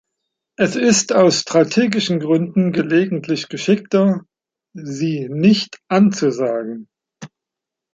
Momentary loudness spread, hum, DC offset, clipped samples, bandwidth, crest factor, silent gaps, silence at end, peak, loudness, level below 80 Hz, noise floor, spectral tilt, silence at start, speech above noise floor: 10 LU; none; under 0.1%; under 0.1%; 9.2 kHz; 16 dB; none; 0.7 s; -2 dBFS; -17 LUFS; -62 dBFS; -84 dBFS; -5 dB/octave; 0.6 s; 68 dB